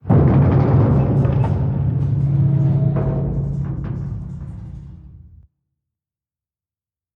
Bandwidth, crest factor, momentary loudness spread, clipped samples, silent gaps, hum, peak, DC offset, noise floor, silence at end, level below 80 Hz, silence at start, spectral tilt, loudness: 3.3 kHz; 16 dB; 17 LU; under 0.1%; none; none; -2 dBFS; under 0.1%; under -90 dBFS; 2 s; -32 dBFS; 0.05 s; -11.5 dB/octave; -18 LUFS